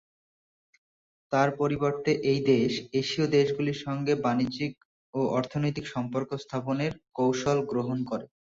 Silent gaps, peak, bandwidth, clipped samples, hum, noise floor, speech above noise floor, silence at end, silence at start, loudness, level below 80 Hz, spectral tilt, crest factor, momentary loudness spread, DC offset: 4.85-5.13 s; -10 dBFS; 7.8 kHz; under 0.1%; none; under -90 dBFS; over 63 dB; 0.3 s; 1.3 s; -28 LUFS; -62 dBFS; -6.5 dB/octave; 18 dB; 9 LU; under 0.1%